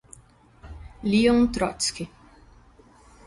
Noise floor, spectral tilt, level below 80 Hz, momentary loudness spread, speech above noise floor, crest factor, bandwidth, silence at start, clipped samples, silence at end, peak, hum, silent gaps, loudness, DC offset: -54 dBFS; -4.5 dB/octave; -46 dBFS; 25 LU; 32 dB; 18 dB; 11.5 kHz; 0.65 s; under 0.1%; 1.2 s; -8 dBFS; none; none; -23 LUFS; under 0.1%